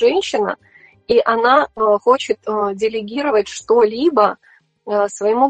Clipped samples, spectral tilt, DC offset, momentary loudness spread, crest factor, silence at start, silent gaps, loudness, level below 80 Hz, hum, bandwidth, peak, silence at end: under 0.1%; -4 dB/octave; under 0.1%; 7 LU; 16 dB; 0 s; none; -17 LUFS; -56 dBFS; none; 9 kHz; 0 dBFS; 0 s